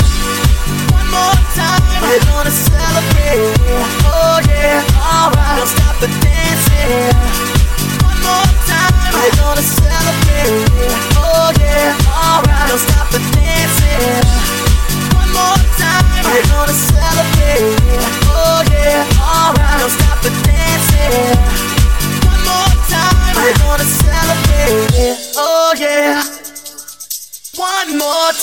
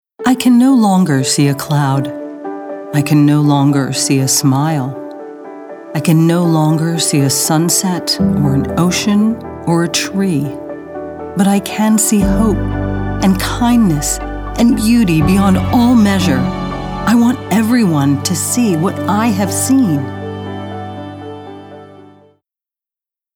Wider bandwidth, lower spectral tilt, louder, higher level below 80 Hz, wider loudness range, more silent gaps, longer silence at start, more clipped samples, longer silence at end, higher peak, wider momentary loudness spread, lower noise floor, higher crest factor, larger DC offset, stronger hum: second, 17 kHz vs over 20 kHz; about the same, -4 dB/octave vs -5 dB/octave; about the same, -11 LUFS vs -13 LUFS; first, -14 dBFS vs -32 dBFS; second, 1 LU vs 4 LU; neither; second, 0 s vs 0.2 s; neither; second, 0 s vs 1.3 s; about the same, 0 dBFS vs 0 dBFS; second, 3 LU vs 15 LU; second, -30 dBFS vs -87 dBFS; about the same, 10 dB vs 12 dB; first, 0.4% vs under 0.1%; neither